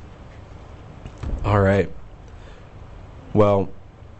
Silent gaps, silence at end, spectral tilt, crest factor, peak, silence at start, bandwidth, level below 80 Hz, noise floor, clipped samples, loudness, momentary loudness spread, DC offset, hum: none; 0 s; -8.5 dB/octave; 18 dB; -4 dBFS; 0 s; 8.2 kHz; -36 dBFS; -41 dBFS; under 0.1%; -21 LUFS; 25 LU; under 0.1%; none